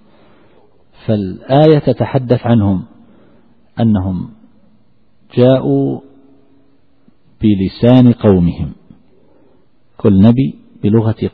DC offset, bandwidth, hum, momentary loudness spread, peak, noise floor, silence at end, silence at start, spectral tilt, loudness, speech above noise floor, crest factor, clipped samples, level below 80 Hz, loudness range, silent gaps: 0.4%; 4.9 kHz; none; 13 LU; 0 dBFS; -55 dBFS; 0.05 s; 1.1 s; -11 dB/octave; -13 LUFS; 44 dB; 14 dB; under 0.1%; -40 dBFS; 5 LU; none